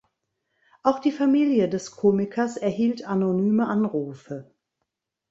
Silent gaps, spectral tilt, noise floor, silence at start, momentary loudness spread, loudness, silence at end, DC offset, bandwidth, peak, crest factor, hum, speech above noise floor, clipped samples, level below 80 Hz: none; -7 dB/octave; -81 dBFS; 0.85 s; 11 LU; -23 LUFS; 0.85 s; under 0.1%; 8 kHz; -4 dBFS; 20 dB; none; 58 dB; under 0.1%; -66 dBFS